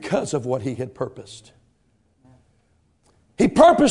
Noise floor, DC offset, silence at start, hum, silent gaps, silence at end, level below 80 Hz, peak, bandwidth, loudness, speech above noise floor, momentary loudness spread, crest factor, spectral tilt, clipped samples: -64 dBFS; under 0.1%; 0 s; none; none; 0 s; -52 dBFS; 0 dBFS; 11 kHz; -20 LUFS; 45 dB; 27 LU; 22 dB; -5.5 dB/octave; under 0.1%